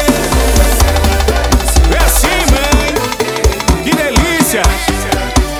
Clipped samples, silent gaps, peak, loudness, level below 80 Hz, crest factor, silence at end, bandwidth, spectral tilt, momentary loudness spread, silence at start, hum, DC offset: under 0.1%; none; 0 dBFS; -11 LUFS; -14 dBFS; 10 dB; 0 s; over 20 kHz; -4 dB/octave; 4 LU; 0 s; none; under 0.1%